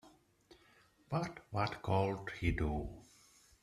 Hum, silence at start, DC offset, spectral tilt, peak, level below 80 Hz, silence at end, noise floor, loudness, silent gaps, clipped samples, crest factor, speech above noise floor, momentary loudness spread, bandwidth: none; 0.05 s; under 0.1%; -7 dB/octave; -18 dBFS; -50 dBFS; 0.6 s; -68 dBFS; -38 LUFS; none; under 0.1%; 20 dB; 31 dB; 8 LU; 13 kHz